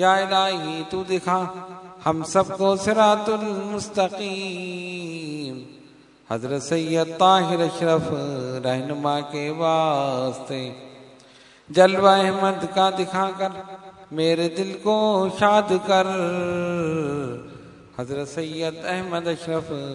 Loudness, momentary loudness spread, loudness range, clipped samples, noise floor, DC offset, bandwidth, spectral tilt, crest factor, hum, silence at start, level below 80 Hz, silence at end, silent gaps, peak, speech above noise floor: -22 LUFS; 14 LU; 6 LU; under 0.1%; -50 dBFS; under 0.1%; 11 kHz; -5 dB/octave; 20 dB; none; 0 s; -62 dBFS; 0 s; none; -2 dBFS; 28 dB